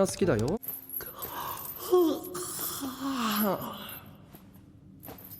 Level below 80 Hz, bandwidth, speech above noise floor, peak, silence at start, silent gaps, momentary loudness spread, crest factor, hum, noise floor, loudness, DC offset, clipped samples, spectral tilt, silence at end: -56 dBFS; over 20 kHz; 24 dB; -12 dBFS; 0 s; none; 19 LU; 18 dB; none; -53 dBFS; -31 LUFS; under 0.1%; under 0.1%; -4.5 dB/octave; 0 s